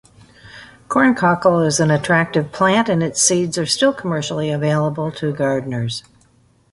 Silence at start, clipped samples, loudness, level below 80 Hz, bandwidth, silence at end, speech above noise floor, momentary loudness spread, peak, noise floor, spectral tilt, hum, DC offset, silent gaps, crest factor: 0.45 s; under 0.1%; -17 LUFS; -52 dBFS; 11.5 kHz; 0.7 s; 38 dB; 8 LU; 0 dBFS; -55 dBFS; -4.5 dB/octave; none; under 0.1%; none; 18 dB